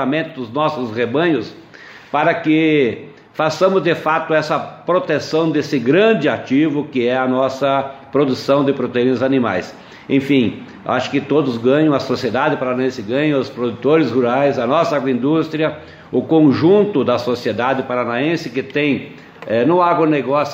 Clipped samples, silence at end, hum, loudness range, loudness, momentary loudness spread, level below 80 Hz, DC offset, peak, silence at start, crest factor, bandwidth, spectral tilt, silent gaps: under 0.1%; 0 s; none; 2 LU; -17 LUFS; 8 LU; -60 dBFS; under 0.1%; -2 dBFS; 0 s; 14 dB; 8 kHz; -6.5 dB/octave; none